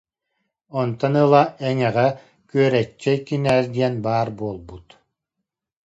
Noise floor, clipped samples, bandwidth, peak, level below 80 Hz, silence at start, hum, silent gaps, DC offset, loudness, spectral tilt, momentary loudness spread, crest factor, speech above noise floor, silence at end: -82 dBFS; under 0.1%; 10.5 kHz; 0 dBFS; -56 dBFS; 0.75 s; none; none; under 0.1%; -20 LUFS; -7.5 dB/octave; 14 LU; 20 dB; 62 dB; 1.05 s